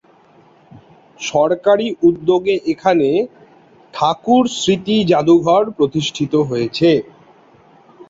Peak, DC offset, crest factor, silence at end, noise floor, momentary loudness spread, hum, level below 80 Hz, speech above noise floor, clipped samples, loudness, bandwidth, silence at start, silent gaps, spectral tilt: -2 dBFS; under 0.1%; 16 dB; 0.05 s; -49 dBFS; 7 LU; none; -56 dBFS; 35 dB; under 0.1%; -15 LUFS; 7.8 kHz; 1.2 s; none; -5.5 dB/octave